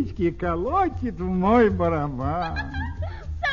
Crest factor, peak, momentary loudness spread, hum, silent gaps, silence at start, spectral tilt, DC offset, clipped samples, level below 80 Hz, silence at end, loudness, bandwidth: 18 dB; -6 dBFS; 12 LU; none; none; 0 s; -8.5 dB/octave; 0.5%; under 0.1%; -36 dBFS; 0 s; -24 LUFS; 7.2 kHz